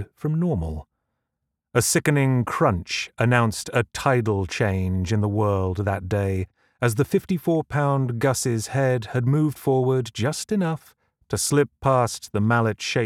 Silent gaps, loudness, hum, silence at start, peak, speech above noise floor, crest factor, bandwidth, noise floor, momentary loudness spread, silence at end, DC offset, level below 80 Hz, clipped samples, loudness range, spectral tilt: none; -23 LUFS; none; 0 s; -4 dBFS; 59 dB; 20 dB; 16.5 kHz; -81 dBFS; 6 LU; 0 s; under 0.1%; -46 dBFS; under 0.1%; 2 LU; -5.5 dB/octave